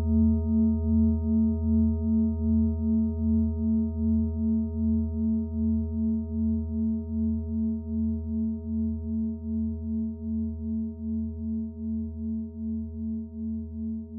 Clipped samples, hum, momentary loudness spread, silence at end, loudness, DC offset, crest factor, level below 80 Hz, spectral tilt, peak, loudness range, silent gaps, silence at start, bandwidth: under 0.1%; none; 9 LU; 0 s; -28 LUFS; under 0.1%; 12 dB; -40 dBFS; -17 dB/octave; -14 dBFS; 7 LU; none; 0 s; 1.3 kHz